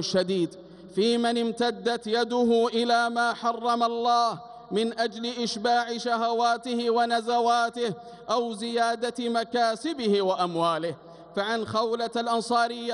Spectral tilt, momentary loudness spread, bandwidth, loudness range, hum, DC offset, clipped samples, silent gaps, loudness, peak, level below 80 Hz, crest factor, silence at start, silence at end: -4 dB/octave; 6 LU; 11.5 kHz; 2 LU; none; under 0.1%; under 0.1%; none; -26 LUFS; -12 dBFS; -70 dBFS; 14 dB; 0 s; 0 s